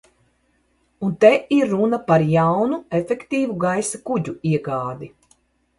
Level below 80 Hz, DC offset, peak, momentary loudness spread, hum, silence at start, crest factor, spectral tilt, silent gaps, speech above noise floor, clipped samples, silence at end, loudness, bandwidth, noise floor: -58 dBFS; under 0.1%; 0 dBFS; 12 LU; none; 1 s; 20 dB; -6.5 dB/octave; none; 45 dB; under 0.1%; 0.7 s; -20 LUFS; 11.5 kHz; -64 dBFS